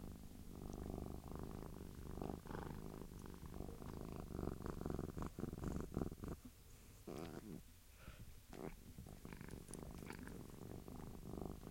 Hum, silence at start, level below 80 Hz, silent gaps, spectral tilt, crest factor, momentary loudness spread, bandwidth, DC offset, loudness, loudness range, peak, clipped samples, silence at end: none; 0 s; -58 dBFS; none; -6.5 dB/octave; 24 dB; 11 LU; 16.5 kHz; under 0.1%; -52 LUFS; 6 LU; -28 dBFS; under 0.1%; 0 s